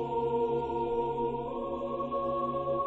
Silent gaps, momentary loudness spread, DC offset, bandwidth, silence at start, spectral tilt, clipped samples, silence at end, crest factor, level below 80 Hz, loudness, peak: none; 5 LU; under 0.1%; 4.3 kHz; 0 s; -9 dB/octave; under 0.1%; 0 s; 12 dB; -54 dBFS; -32 LUFS; -20 dBFS